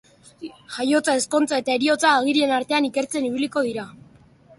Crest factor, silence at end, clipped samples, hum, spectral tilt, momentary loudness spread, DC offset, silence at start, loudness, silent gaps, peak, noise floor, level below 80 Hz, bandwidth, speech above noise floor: 18 dB; 0.7 s; under 0.1%; none; -2.5 dB/octave; 18 LU; under 0.1%; 0.4 s; -21 LUFS; none; -4 dBFS; -51 dBFS; -66 dBFS; 11.5 kHz; 31 dB